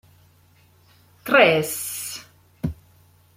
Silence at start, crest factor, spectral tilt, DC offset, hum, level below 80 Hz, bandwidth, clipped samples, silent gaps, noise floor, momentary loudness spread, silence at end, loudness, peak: 1.25 s; 22 dB; -3.5 dB/octave; under 0.1%; none; -52 dBFS; 16.5 kHz; under 0.1%; none; -56 dBFS; 19 LU; 0.65 s; -21 LUFS; -2 dBFS